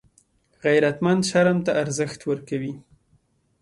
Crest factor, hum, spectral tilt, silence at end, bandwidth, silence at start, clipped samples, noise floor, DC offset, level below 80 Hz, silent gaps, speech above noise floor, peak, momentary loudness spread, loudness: 16 dB; none; -5.5 dB/octave; 0.8 s; 11.5 kHz; 0.65 s; under 0.1%; -64 dBFS; under 0.1%; -62 dBFS; none; 42 dB; -6 dBFS; 10 LU; -22 LUFS